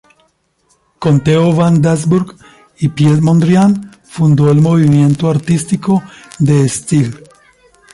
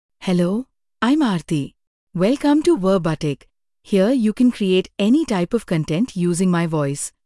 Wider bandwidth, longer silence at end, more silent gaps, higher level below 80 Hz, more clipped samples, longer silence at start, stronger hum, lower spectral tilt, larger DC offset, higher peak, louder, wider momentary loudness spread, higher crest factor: about the same, 11.5 kHz vs 12 kHz; first, 0.75 s vs 0.2 s; second, none vs 1.87-2.07 s; about the same, -46 dBFS vs -50 dBFS; neither; first, 1 s vs 0.2 s; neither; first, -7.5 dB/octave vs -6 dB/octave; neither; first, 0 dBFS vs -6 dBFS; first, -12 LUFS vs -19 LUFS; about the same, 9 LU vs 8 LU; about the same, 12 dB vs 14 dB